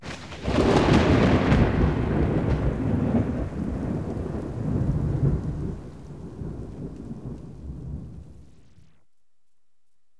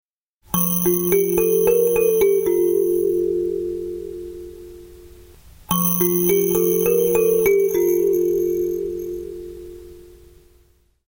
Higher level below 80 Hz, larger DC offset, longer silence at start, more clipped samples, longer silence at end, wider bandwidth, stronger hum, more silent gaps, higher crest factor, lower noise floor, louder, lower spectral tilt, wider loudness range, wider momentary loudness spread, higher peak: first, -34 dBFS vs -48 dBFS; first, 0.4% vs under 0.1%; second, 0 s vs 0.5 s; neither; first, 1.75 s vs 1.1 s; second, 11 kHz vs 17 kHz; neither; neither; about the same, 20 dB vs 16 dB; first, -81 dBFS vs -58 dBFS; second, -24 LUFS vs -18 LUFS; first, -7.5 dB/octave vs -5.5 dB/octave; first, 17 LU vs 6 LU; about the same, 19 LU vs 17 LU; about the same, -6 dBFS vs -4 dBFS